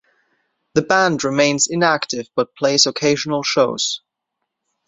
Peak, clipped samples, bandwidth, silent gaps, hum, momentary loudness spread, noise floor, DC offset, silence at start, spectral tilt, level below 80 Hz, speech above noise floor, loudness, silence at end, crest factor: 0 dBFS; under 0.1%; 8.2 kHz; none; none; 8 LU; -78 dBFS; under 0.1%; 0.75 s; -3 dB/octave; -60 dBFS; 61 dB; -17 LUFS; 0.9 s; 20 dB